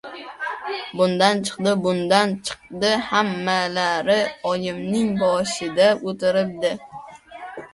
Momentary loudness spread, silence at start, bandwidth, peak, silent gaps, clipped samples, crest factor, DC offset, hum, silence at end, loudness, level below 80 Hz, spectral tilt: 14 LU; 0.05 s; 11.5 kHz; -2 dBFS; none; under 0.1%; 20 dB; under 0.1%; none; 0.05 s; -21 LUFS; -60 dBFS; -4.5 dB/octave